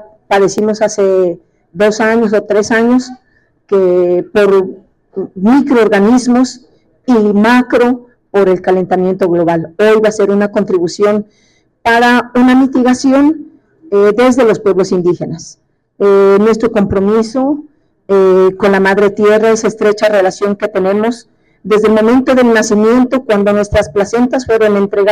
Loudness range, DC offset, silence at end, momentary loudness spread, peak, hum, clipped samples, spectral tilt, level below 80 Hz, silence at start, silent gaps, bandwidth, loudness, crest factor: 2 LU; under 0.1%; 0 s; 7 LU; -2 dBFS; none; under 0.1%; -5.5 dB/octave; -42 dBFS; 0.3 s; none; 13 kHz; -10 LUFS; 8 dB